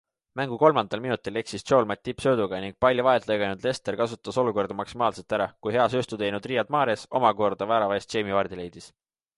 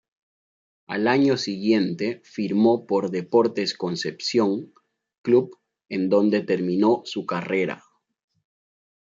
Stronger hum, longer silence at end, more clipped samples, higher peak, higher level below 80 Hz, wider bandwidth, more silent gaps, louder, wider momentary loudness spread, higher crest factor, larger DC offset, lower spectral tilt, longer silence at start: neither; second, 0.5 s vs 1.25 s; neither; about the same, -4 dBFS vs -6 dBFS; first, -58 dBFS vs -72 dBFS; first, 11.5 kHz vs 7.6 kHz; second, none vs 5.18-5.24 s; about the same, -25 LUFS vs -23 LUFS; about the same, 9 LU vs 10 LU; about the same, 22 dB vs 18 dB; neither; about the same, -5.5 dB/octave vs -6 dB/octave; second, 0.35 s vs 0.9 s